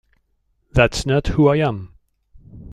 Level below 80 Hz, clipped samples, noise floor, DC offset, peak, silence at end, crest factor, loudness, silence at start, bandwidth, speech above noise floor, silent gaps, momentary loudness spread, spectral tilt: -34 dBFS; under 0.1%; -66 dBFS; under 0.1%; -2 dBFS; 0 s; 18 dB; -18 LUFS; 0.75 s; 13 kHz; 49 dB; none; 7 LU; -6 dB/octave